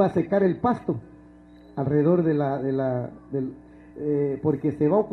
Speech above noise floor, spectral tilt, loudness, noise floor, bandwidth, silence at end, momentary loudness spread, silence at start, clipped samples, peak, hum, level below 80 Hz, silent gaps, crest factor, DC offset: 26 dB; -10.5 dB/octave; -25 LUFS; -49 dBFS; 6.2 kHz; 0 s; 12 LU; 0 s; under 0.1%; -8 dBFS; none; -56 dBFS; none; 16 dB; under 0.1%